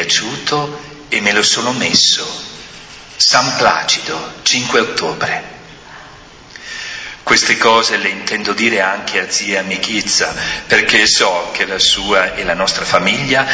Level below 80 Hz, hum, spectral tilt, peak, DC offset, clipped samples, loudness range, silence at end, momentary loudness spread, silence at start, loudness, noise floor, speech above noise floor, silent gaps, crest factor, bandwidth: -46 dBFS; none; -1.5 dB/octave; 0 dBFS; under 0.1%; under 0.1%; 4 LU; 0 s; 15 LU; 0 s; -13 LUFS; -38 dBFS; 23 dB; none; 16 dB; 8 kHz